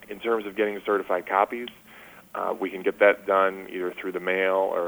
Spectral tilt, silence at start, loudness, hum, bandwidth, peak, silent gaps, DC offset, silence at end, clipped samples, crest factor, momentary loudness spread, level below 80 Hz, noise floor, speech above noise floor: -5.5 dB/octave; 0 s; -25 LUFS; none; over 20 kHz; -6 dBFS; none; under 0.1%; 0 s; under 0.1%; 20 dB; 11 LU; -68 dBFS; -49 dBFS; 24 dB